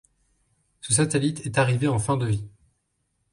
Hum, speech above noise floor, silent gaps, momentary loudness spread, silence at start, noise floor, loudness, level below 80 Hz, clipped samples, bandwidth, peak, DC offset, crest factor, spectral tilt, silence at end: none; 51 dB; none; 10 LU; 0.85 s; -74 dBFS; -24 LUFS; -52 dBFS; under 0.1%; 11.5 kHz; -6 dBFS; under 0.1%; 20 dB; -5 dB/octave; 0.85 s